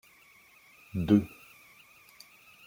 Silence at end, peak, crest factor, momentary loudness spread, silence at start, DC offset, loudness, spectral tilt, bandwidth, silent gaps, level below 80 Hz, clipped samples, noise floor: 1.4 s; -10 dBFS; 22 dB; 27 LU; 0.95 s; under 0.1%; -28 LUFS; -8 dB/octave; 17 kHz; none; -60 dBFS; under 0.1%; -59 dBFS